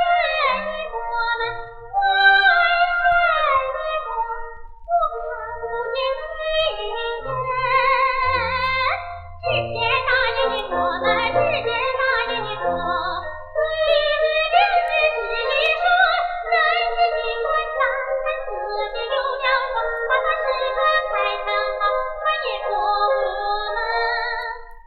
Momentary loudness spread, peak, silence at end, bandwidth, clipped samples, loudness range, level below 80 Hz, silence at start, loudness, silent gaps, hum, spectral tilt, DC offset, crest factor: 10 LU; -4 dBFS; 0.05 s; 5.8 kHz; under 0.1%; 4 LU; -42 dBFS; 0 s; -20 LUFS; none; none; -5 dB/octave; under 0.1%; 18 dB